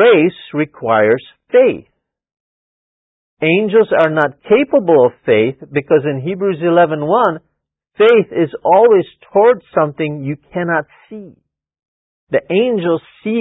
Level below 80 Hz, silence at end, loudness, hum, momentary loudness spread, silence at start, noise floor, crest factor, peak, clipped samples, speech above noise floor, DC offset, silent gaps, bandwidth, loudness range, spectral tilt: -58 dBFS; 0 s; -14 LUFS; none; 10 LU; 0 s; -69 dBFS; 14 dB; 0 dBFS; under 0.1%; 56 dB; under 0.1%; 2.40-3.37 s, 11.88-12.27 s; 4 kHz; 5 LU; -9 dB/octave